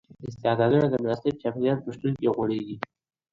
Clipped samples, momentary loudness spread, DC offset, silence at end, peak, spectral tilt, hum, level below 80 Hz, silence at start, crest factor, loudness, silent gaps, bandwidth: under 0.1%; 14 LU; under 0.1%; 0.55 s; -8 dBFS; -8.5 dB/octave; none; -60 dBFS; 0.2 s; 18 dB; -26 LUFS; none; 7.6 kHz